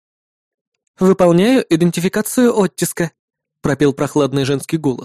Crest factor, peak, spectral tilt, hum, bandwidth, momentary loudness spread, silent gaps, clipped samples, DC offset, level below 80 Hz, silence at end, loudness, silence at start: 16 dB; 0 dBFS; -6 dB/octave; none; 15 kHz; 8 LU; 3.19-3.28 s; under 0.1%; under 0.1%; -50 dBFS; 0 s; -16 LUFS; 1 s